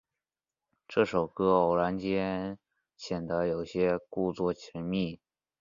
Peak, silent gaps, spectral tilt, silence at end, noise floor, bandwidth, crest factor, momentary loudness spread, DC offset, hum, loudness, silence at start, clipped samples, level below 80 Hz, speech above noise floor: -10 dBFS; none; -7 dB/octave; 0.45 s; under -90 dBFS; 7.4 kHz; 20 dB; 12 LU; under 0.1%; none; -30 LUFS; 0.9 s; under 0.1%; -58 dBFS; over 61 dB